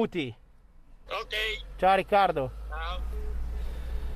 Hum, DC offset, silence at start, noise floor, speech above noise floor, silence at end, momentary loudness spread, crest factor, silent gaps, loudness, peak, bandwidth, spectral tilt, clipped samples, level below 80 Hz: none; under 0.1%; 0 s; -53 dBFS; 26 dB; 0 s; 14 LU; 18 dB; none; -29 LUFS; -12 dBFS; 14.5 kHz; -5.5 dB/octave; under 0.1%; -38 dBFS